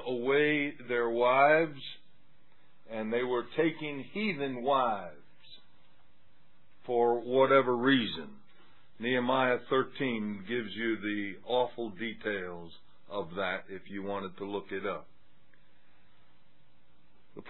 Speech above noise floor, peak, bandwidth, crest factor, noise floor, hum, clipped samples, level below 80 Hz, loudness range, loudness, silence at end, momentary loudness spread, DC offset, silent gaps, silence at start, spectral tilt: 38 dB; -10 dBFS; 4.3 kHz; 22 dB; -69 dBFS; none; under 0.1%; -76 dBFS; 10 LU; -31 LUFS; 0 s; 17 LU; 0.4%; none; 0 s; -8.5 dB/octave